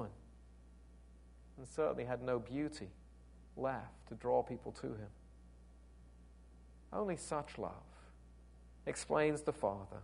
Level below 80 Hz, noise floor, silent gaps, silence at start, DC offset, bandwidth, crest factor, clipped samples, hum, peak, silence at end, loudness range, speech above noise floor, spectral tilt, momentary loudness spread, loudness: -60 dBFS; -60 dBFS; none; 0 s; under 0.1%; 10.5 kHz; 22 dB; under 0.1%; 60 Hz at -60 dBFS; -20 dBFS; 0 s; 6 LU; 20 dB; -5.5 dB/octave; 26 LU; -41 LUFS